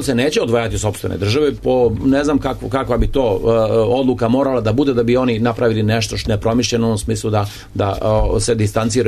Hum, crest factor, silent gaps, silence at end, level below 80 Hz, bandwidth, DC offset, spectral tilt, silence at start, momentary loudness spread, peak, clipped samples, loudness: none; 12 dB; none; 0 s; -30 dBFS; 13.5 kHz; under 0.1%; -6 dB/octave; 0 s; 5 LU; -4 dBFS; under 0.1%; -17 LUFS